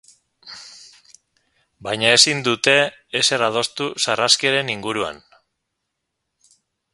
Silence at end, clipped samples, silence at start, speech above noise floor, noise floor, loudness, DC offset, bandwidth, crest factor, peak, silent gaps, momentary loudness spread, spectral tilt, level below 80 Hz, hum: 1.75 s; under 0.1%; 0.45 s; 59 dB; -78 dBFS; -17 LUFS; under 0.1%; 16 kHz; 22 dB; 0 dBFS; none; 22 LU; -1.5 dB/octave; -62 dBFS; none